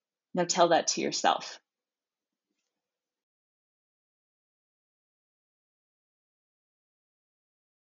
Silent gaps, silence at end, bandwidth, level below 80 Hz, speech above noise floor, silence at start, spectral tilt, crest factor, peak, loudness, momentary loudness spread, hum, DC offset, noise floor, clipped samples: none; 6.25 s; 8 kHz; -88 dBFS; over 63 dB; 0.35 s; -2 dB/octave; 26 dB; -8 dBFS; -27 LUFS; 12 LU; none; under 0.1%; under -90 dBFS; under 0.1%